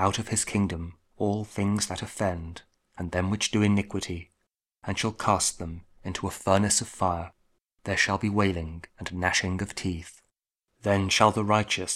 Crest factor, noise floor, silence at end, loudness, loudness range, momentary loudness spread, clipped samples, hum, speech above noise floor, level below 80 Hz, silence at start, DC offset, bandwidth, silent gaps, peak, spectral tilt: 24 dB; -79 dBFS; 0 s; -27 LUFS; 3 LU; 16 LU; under 0.1%; none; 52 dB; -50 dBFS; 0 s; under 0.1%; 15 kHz; none; -4 dBFS; -4 dB/octave